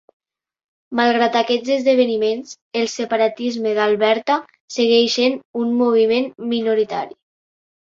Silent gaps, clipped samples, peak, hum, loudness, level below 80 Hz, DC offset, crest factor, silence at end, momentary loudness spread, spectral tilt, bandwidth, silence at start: 2.61-2.71 s, 4.60-4.68 s, 5.45-5.54 s; under 0.1%; -2 dBFS; none; -18 LUFS; -68 dBFS; under 0.1%; 16 dB; 0.85 s; 8 LU; -3.5 dB/octave; 7.6 kHz; 0.9 s